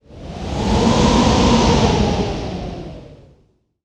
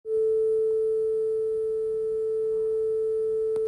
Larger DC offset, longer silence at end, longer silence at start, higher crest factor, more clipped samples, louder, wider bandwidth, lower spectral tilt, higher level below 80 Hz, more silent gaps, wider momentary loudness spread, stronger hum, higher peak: neither; first, 0.7 s vs 0 s; about the same, 0.1 s vs 0.05 s; first, 16 dB vs 6 dB; neither; first, -16 LUFS vs -26 LUFS; first, 11 kHz vs 9.8 kHz; second, -5.5 dB/octave vs -7 dB/octave; first, -26 dBFS vs -60 dBFS; neither; first, 17 LU vs 4 LU; neither; first, 0 dBFS vs -20 dBFS